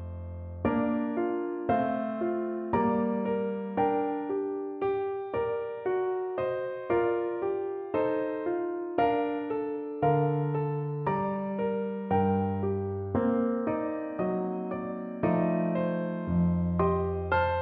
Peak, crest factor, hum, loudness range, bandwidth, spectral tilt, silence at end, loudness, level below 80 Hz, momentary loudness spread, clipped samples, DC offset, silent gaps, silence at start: -12 dBFS; 16 dB; none; 2 LU; 4.5 kHz; -11.5 dB/octave; 0 s; -30 LUFS; -54 dBFS; 6 LU; under 0.1%; under 0.1%; none; 0 s